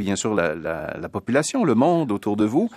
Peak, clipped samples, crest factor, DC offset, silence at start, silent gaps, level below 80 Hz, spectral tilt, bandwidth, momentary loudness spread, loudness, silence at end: -4 dBFS; under 0.1%; 18 dB; under 0.1%; 0 s; none; -54 dBFS; -5.5 dB/octave; 14 kHz; 10 LU; -22 LUFS; 0 s